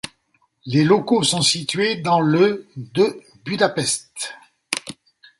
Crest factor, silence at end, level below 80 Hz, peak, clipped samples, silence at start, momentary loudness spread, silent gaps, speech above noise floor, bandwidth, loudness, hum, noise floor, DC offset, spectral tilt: 20 dB; 0.5 s; -62 dBFS; 0 dBFS; under 0.1%; 0.05 s; 14 LU; none; 46 dB; 11.5 kHz; -19 LUFS; none; -65 dBFS; under 0.1%; -4 dB/octave